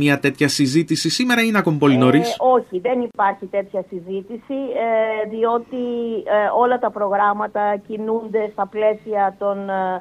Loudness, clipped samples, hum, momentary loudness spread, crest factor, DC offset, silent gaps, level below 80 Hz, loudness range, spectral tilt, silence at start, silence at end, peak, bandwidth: -19 LUFS; under 0.1%; none; 9 LU; 18 dB; under 0.1%; none; -62 dBFS; 5 LU; -5 dB/octave; 0 s; 0 s; -2 dBFS; 15 kHz